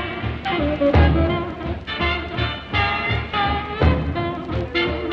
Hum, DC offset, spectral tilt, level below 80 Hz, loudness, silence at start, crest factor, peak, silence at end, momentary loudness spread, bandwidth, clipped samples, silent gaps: none; under 0.1%; -8 dB/octave; -28 dBFS; -21 LUFS; 0 s; 18 dB; -2 dBFS; 0 s; 9 LU; 6 kHz; under 0.1%; none